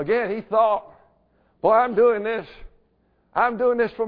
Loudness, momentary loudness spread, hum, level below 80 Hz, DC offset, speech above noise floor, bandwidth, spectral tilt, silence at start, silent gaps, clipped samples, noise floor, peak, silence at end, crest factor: -21 LUFS; 9 LU; none; -54 dBFS; under 0.1%; 44 dB; 5 kHz; -9 dB/octave; 0 s; none; under 0.1%; -64 dBFS; -6 dBFS; 0 s; 16 dB